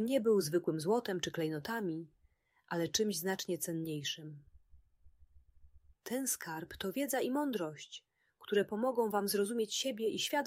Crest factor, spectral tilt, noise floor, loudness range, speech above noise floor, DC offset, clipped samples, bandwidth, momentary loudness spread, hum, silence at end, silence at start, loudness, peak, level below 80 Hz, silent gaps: 18 dB; -4 dB/octave; -73 dBFS; 6 LU; 37 dB; under 0.1%; under 0.1%; 16 kHz; 11 LU; none; 0 s; 0 s; -36 LUFS; -18 dBFS; -70 dBFS; none